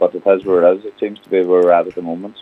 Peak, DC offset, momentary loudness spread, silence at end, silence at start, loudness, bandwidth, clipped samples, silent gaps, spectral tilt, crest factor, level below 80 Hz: 0 dBFS; under 0.1%; 13 LU; 0 s; 0 s; -15 LUFS; 4.2 kHz; under 0.1%; none; -8 dB/octave; 14 dB; -64 dBFS